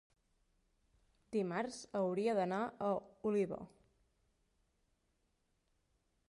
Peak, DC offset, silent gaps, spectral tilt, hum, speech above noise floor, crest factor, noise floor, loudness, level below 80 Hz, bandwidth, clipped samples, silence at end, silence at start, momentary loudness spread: -24 dBFS; under 0.1%; none; -6.5 dB/octave; none; 43 dB; 18 dB; -81 dBFS; -39 LUFS; -76 dBFS; 11.5 kHz; under 0.1%; 2.6 s; 1.3 s; 6 LU